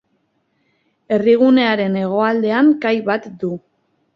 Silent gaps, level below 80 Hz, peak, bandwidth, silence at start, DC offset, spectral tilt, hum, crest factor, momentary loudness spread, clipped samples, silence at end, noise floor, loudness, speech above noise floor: none; -62 dBFS; -2 dBFS; 6.2 kHz; 1.1 s; under 0.1%; -8 dB/octave; none; 16 dB; 13 LU; under 0.1%; 0.6 s; -66 dBFS; -16 LUFS; 50 dB